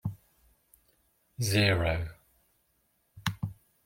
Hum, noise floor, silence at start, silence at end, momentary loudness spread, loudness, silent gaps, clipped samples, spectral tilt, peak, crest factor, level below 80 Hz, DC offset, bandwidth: none; -73 dBFS; 0.05 s; 0.3 s; 16 LU; -30 LUFS; none; under 0.1%; -5 dB/octave; -10 dBFS; 24 dB; -52 dBFS; under 0.1%; 16.5 kHz